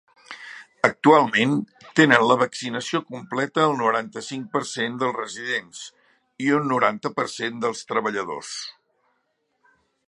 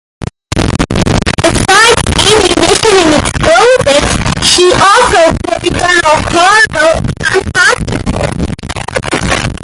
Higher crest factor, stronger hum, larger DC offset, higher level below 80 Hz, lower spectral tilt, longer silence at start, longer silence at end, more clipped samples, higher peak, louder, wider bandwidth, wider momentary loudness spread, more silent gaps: first, 24 dB vs 8 dB; neither; neither; second, -72 dBFS vs -22 dBFS; about the same, -4.5 dB/octave vs -3.5 dB/octave; about the same, 0.3 s vs 0.2 s; first, 1.35 s vs 0 s; second, under 0.1% vs 0.3%; about the same, 0 dBFS vs 0 dBFS; second, -22 LUFS vs -8 LUFS; second, 11 kHz vs 16 kHz; first, 20 LU vs 10 LU; neither